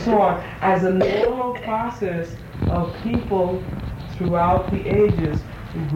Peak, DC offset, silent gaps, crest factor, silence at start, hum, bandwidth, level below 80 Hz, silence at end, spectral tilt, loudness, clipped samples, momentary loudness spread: -8 dBFS; under 0.1%; none; 14 dB; 0 s; none; 16 kHz; -36 dBFS; 0 s; -8.5 dB/octave; -21 LUFS; under 0.1%; 11 LU